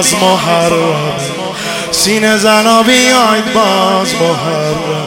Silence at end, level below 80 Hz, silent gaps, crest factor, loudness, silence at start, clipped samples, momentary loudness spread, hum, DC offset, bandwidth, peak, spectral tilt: 0 s; -46 dBFS; none; 10 dB; -10 LUFS; 0 s; 0.9%; 10 LU; none; under 0.1%; over 20 kHz; 0 dBFS; -3 dB/octave